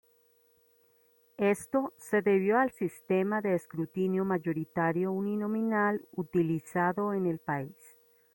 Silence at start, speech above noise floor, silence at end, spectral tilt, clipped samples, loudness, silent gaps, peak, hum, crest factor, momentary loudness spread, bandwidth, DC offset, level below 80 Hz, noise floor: 1.4 s; 37 dB; 0.65 s; -7.5 dB/octave; under 0.1%; -30 LUFS; none; -14 dBFS; none; 16 dB; 7 LU; 16.5 kHz; under 0.1%; -72 dBFS; -67 dBFS